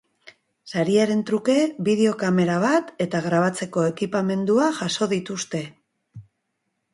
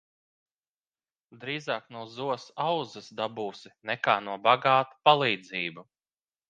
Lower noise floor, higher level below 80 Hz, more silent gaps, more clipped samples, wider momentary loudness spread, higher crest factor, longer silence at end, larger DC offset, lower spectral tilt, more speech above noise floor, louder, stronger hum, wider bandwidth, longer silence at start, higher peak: second, -76 dBFS vs under -90 dBFS; first, -66 dBFS vs -80 dBFS; neither; neither; second, 8 LU vs 15 LU; second, 16 dB vs 26 dB; about the same, 0.7 s vs 0.7 s; neither; about the same, -5.5 dB/octave vs -5 dB/octave; second, 55 dB vs over 62 dB; first, -22 LUFS vs -28 LUFS; neither; first, 11.5 kHz vs 8.8 kHz; second, 0.25 s vs 1.35 s; about the same, -6 dBFS vs -4 dBFS